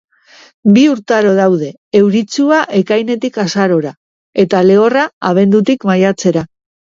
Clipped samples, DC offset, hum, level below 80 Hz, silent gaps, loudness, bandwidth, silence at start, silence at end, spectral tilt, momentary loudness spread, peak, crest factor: under 0.1%; under 0.1%; none; -56 dBFS; 1.78-1.91 s, 3.97-4.33 s, 5.13-5.21 s; -12 LUFS; 7.6 kHz; 0.65 s; 0.35 s; -6 dB/octave; 8 LU; 0 dBFS; 12 dB